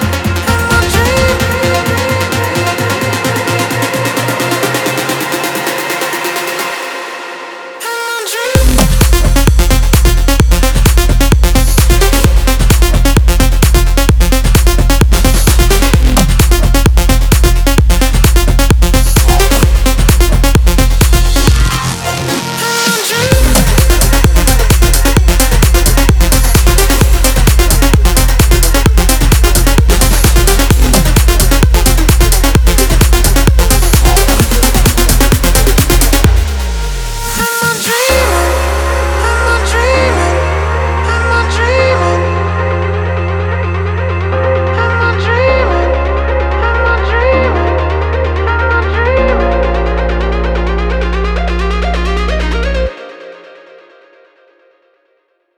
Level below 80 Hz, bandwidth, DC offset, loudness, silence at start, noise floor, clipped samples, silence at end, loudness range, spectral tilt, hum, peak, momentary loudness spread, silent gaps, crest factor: -12 dBFS; over 20 kHz; under 0.1%; -11 LUFS; 0 s; -59 dBFS; under 0.1%; 2.25 s; 5 LU; -4.5 dB/octave; none; 0 dBFS; 6 LU; none; 8 dB